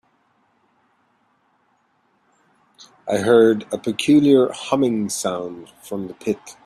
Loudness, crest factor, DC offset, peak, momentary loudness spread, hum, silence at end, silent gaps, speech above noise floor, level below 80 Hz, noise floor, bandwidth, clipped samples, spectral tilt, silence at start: -19 LUFS; 20 dB; under 0.1%; -2 dBFS; 17 LU; none; 0.15 s; none; 45 dB; -64 dBFS; -64 dBFS; 13.5 kHz; under 0.1%; -5 dB/octave; 3.05 s